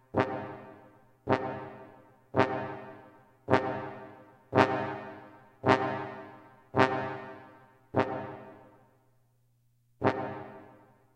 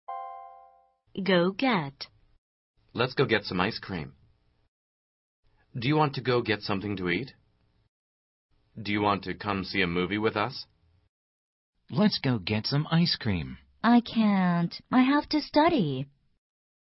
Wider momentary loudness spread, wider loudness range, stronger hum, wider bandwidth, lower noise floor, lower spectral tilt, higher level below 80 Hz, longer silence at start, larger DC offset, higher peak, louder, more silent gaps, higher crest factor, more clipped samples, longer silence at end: first, 23 LU vs 17 LU; about the same, 6 LU vs 6 LU; neither; first, 9.8 kHz vs 6 kHz; about the same, -69 dBFS vs -68 dBFS; second, -7 dB/octave vs -8.5 dB/octave; second, -68 dBFS vs -58 dBFS; about the same, 0.15 s vs 0.1 s; neither; first, -4 dBFS vs -8 dBFS; second, -31 LUFS vs -27 LUFS; second, none vs 2.38-2.74 s, 4.68-5.43 s, 7.88-8.49 s, 11.09-11.73 s; first, 28 dB vs 20 dB; neither; second, 0.45 s vs 0.85 s